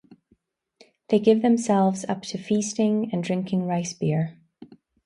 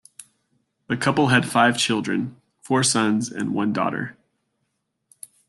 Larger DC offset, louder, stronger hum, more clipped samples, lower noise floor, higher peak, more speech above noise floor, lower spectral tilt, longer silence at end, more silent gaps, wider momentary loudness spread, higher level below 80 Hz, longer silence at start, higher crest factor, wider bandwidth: neither; second, -24 LUFS vs -21 LUFS; neither; neither; second, -66 dBFS vs -75 dBFS; about the same, -6 dBFS vs -4 dBFS; second, 44 dB vs 54 dB; first, -6 dB/octave vs -4 dB/octave; second, 0.4 s vs 1.35 s; neither; about the same, 9 LU vs 11 LU; about the same, -68 dBFS vs -64 dBFS; first, 1.1 s vs 0.2 s; about the same, 18 dB vs 20 dB; second, 11 kHz vs 12.5 kHz